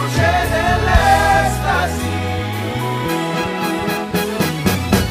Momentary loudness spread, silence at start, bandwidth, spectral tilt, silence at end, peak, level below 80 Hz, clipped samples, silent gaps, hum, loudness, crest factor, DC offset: 8 LU; 0 s; 15.5 kHz; -5 dB/octave; 0 s; 0 dBFS; -26 dBFS; under 0.1%; none; none; -17 LUFS; 16 dB; under 0.1%